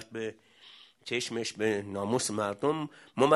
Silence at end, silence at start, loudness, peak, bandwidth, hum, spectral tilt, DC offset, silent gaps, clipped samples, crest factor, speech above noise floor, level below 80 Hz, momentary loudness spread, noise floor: 0 s; 0 s; -32 LUFS; -8 dBFS; 12 kHz; none; -4 dB/octave; under 0.1%; none; under 0.1%; 24 dB; 26 dB; -74 dBFS; 18 LU; -56 dBFS